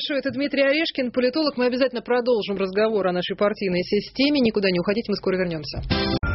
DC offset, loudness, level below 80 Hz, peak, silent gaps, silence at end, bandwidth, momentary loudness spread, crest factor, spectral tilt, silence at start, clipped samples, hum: under 0.1%; -22 LUFS; -42 dBFS; -6 dBFS; none; 0 s; 6 kHz; 5 LU; 16 dB; -4 dB/octave; 0 s; under 0.1%; none